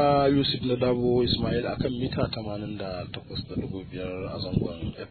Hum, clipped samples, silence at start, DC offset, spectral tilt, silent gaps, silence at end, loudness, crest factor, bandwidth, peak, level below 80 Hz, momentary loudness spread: none; under 0.1%; 0 s; under 0.1%; -9.5 dB/octave; none; 0 s; -28 LUFS; 16 dB; 4.6 kHz; -10 dBFS; -46 dBFS; 12 LU